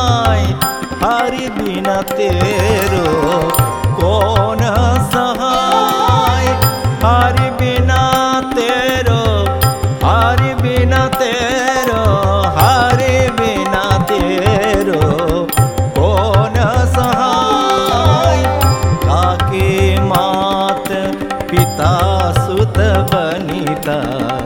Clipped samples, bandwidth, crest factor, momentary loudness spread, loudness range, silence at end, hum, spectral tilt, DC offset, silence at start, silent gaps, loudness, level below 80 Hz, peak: under 0.1%; 19 kHz; 12 dB; 5 LU; 2 LU; 0 s; none; -5.5 dB/octave; under 0.1%; 0 s; none; -13 LUFS; -26 dBFS; 0 dBFS